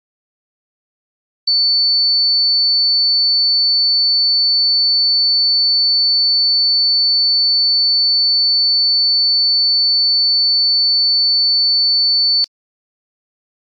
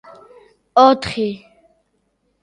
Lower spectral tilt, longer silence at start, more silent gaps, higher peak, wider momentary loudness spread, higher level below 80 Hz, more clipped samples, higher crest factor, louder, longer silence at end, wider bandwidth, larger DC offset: second, 4 dB/octave vs -5.5 dB/octave; first, 1.45 s vs 0.75 s; neither; second, -10 dBFS vs 0 dBFS; second, 0 LU vs 13 LU; second, under -90 dBFS vs -52 dBFS; neither; second, 4 dB vs 20 dB; first, -10 LUFS vs -16 LUFS; about the same, 1.15 s vs 1.05 s; second, 5.6 kHz vs 10 kHz; neither